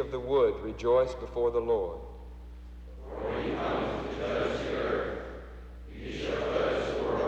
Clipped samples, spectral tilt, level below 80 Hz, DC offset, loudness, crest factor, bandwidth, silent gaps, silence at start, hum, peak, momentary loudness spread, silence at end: under 0.1%; -6.5 dB/octave; -44 dBFS; under 0.1%; -31 LUFS; 16 dB; 8.4 kHz; none; 0 s; none; -14 dBFS; 20 LU; 0 s